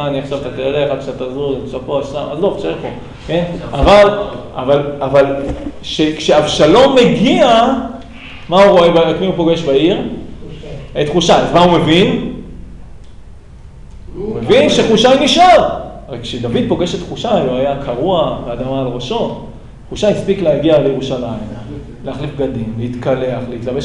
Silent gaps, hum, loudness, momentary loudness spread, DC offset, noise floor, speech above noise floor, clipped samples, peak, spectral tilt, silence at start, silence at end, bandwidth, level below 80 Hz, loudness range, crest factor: none; none; -13 LUFS; 18 LU; under 0.1%; -34 dBFS; 22 dB; under 0.1%; 0 dBFS; -5.5 dB/octave; 0 s; 0 s; 11 kHz; -32 dBFS; 6 LU; 12 dB